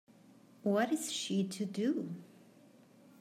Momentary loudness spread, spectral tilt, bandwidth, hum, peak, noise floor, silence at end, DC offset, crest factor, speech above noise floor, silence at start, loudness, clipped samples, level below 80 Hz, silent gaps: 9 LU; -4.5 dB/octave; 16 kHz; none; -20 dBFS; -61 dBFS; 0.8 s; under 0.1%; 18 dB; 27 dB; 0.65 s; -35 LUFS; under 0.1%; under -90 dBFS; none